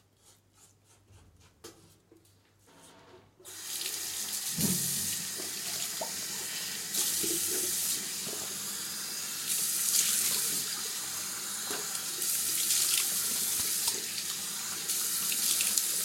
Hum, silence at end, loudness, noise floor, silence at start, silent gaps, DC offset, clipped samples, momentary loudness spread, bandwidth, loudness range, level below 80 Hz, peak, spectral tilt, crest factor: none; 0 s; -29 LUFS; -64 dBFS; 0.3 s; none; under 0.1%; under 0.1%; 8 LU; 16.5 kHz; 6 LU; -72 dBFS; -6 dBFS; 0 dB/octave; 28 dB